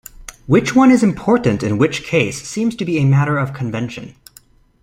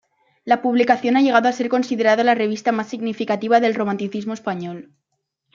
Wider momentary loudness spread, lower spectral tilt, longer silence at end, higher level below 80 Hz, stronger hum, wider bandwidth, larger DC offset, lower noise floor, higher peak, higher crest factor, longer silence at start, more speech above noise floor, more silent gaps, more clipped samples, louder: first, 15 LU vs 11 LU; about the same, -6.5 dB/octave vs -5.5 dB/octave; about the same, 0.7 s vs 0.7 s; first, -46 dBFS vs -70 dBFS; neither; first, 15 kHz vs 7.4 kHz; neither; second, -49 dBFS vs -75 dBFS; about the same, 0 dBFS vs -2 dBFS; about the same, 16 dB vs 18 dB; second, 0.2 s vs 0.45 s; second, 33 dB vs 57 dB; neither; neither; first, -16 LUFS vs -19 LUFS